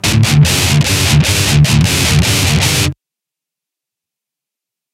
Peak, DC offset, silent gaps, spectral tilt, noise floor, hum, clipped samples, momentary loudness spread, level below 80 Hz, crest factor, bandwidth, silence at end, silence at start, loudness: 0 dBFS; under 0.1%; none; -4 dB/octave; -84 dBFS; none; under 0.1%; 2 LU; -26 dBFS; 12 dB; 16.5 kHz; 2 s; 0.05 s; -10 LUFS